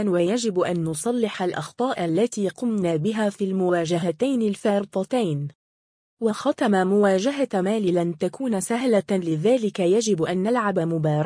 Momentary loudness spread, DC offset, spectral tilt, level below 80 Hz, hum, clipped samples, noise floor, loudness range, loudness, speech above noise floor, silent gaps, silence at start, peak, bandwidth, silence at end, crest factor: 6 LU; under 0.1%; -6 dB/octave; -66 dBFS; none; under 0.1%; under -90 dBFS; 2 LU; -23 LUFS; over 68 dB; 5.55-6.17 s; 0 s; -8 dBFS; 10.5 kHz; 0 s; 14 dB